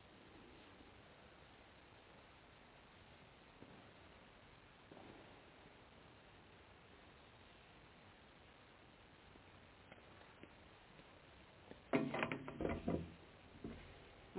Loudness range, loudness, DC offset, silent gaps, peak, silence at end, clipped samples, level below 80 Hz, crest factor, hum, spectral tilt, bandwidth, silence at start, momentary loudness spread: 17 LU; -50 LUFS; under 0.1%; none; -22 dBFS; 0 s; under 0.1%; -68 dBFS; 30 dB; none; -5 dB/octave; 4 kHz; 0 s; 19 LU